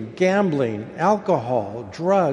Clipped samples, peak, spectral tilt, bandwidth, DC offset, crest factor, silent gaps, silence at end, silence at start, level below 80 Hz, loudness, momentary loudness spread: under 0.1%; -4 dBFS; -7 dB/octave; 10.5 kHz; under 0.1%; 16 dB; none; 0 s; 0 s; -60 dBFS; -21 LUFS; 7 LU